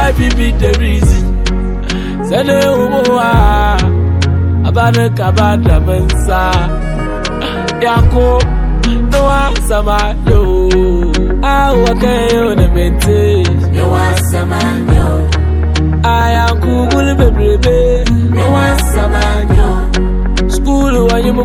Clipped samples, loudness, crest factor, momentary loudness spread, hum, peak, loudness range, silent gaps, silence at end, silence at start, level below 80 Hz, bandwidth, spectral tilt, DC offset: 0.3%; -11 LUFS; 10 dB; 5 LU; none; 0 dBFS; 2 LU; none; 0 s; 0 s; -14 dBFS; 16 kHz; -6 dB/octave; under 0.1%